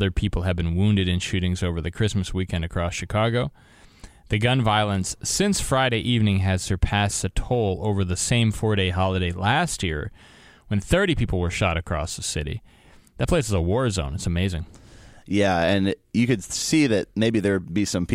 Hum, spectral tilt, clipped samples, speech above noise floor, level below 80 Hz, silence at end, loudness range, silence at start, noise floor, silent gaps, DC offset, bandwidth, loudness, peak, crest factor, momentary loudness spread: none; -5 dB/octave; under 0.1%; 24 dB; -36 dBFS; 0 s; 3 LU; 0 s; -47 dBFS; none; under 0.1%; 15.5 kHz; -23 LUFS; -4 dBFS; 18 dB; 7 LU